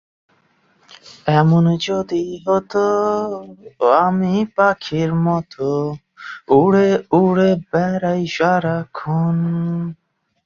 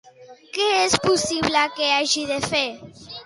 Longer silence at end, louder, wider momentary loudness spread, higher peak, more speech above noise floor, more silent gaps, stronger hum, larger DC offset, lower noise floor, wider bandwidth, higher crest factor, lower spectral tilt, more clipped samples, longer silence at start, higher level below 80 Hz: first, 0.5 s vs 0 s; first, -17 LUFS vs -20 LUFS; about the same, 11 LU vs 11 LU; about the same, -2 dBFS vs -4 dBFS; first, 42 dB vs 22 dB; neither; neither; neither; first, -59 dBFS vs -44 dBFS; second, 7.2 kHz vs 11.5 kHz; about the same, 16 dB vs 18 dB; first, -7.5 dB/octave vs -2 dB/octave; neither; first, 1.05 s vs 0.2 s; about the same, -54 dBFS vs -54 dBFS